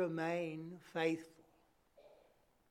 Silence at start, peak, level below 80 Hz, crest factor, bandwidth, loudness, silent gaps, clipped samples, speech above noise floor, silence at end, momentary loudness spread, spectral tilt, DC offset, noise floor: 0 s; -24 dBFS; -82 dBFS; 18 dB; 14 kHz; -41 LUFS; none; under 0.1%; 33 dB; 0.55 s; 10 LU; -6.5 dB/octave; under 0.1%; -73 dBFS